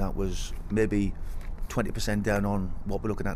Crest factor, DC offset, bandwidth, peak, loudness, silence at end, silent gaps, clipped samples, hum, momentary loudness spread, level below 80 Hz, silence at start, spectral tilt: 16 dB; under 0.1%; 15.5 kHz; -12 dBFS; -30 LUFS; 0 s; none; under 0.1%; none; 11 LU; -34 dBFS; 0 s; -6 dB/octave